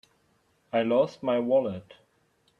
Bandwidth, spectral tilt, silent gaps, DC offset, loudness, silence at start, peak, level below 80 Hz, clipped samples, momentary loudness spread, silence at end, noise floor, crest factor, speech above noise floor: 7.2 kHz; -7.5 dB/octave; none; under 0.1%; -26 LUFS; 0.75 s; -12 dBFS; -72 dBFS; under 0.1%; 10 LU; 0.8 s; -68 dBFS; 16 dB; 43 dB